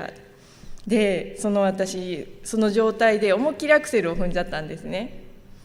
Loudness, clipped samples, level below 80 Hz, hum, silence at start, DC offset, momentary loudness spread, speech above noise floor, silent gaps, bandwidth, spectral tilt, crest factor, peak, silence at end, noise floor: -23 LUFS; under 0.1%; -40 dBFS; none; 0 s; under 0.1%; 13 LU; 26 dB; none; 15.5 kHz; -5 dB/octave; 18 dB; -6 dBFS; 0.1 s; -48 dBFS